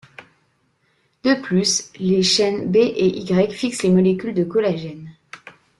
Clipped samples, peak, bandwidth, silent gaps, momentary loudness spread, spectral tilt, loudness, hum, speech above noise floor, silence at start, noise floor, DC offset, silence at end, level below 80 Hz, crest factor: under 0.1%; -6 dBFS; 12 kHz; none; 11 LU; -4.5 dB/octave; -19 LUFS; none; 46 dB; 0.2 s; -64 dBFS; under 0.1%; 0.3 s; -58 dBFS; 14 dB